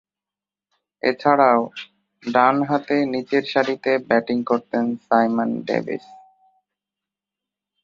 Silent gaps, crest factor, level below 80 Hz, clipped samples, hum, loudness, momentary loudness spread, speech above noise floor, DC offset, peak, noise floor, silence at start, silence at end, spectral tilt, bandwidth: none; 20 dB; -68 dBFS; under 0.1%; 50 Hz at -50 dBFS; -20 LUFS; 8 LU; 70 dB; under 0.1%; -2 dBFS; -90 dBFS; 1.05 s; 1.65 s; -6.5 dB/octave; 7.2 kHz